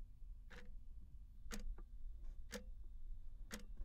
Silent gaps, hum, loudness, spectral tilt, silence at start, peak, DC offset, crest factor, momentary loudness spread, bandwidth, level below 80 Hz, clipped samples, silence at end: none; none; -57 LUFS; -4 dB/octave; 0 s; -34 dBFS; under 0.1%; 16 dB; 8 LU; 15.5 kHz; -52 dBFS; under 0.1%; 0 s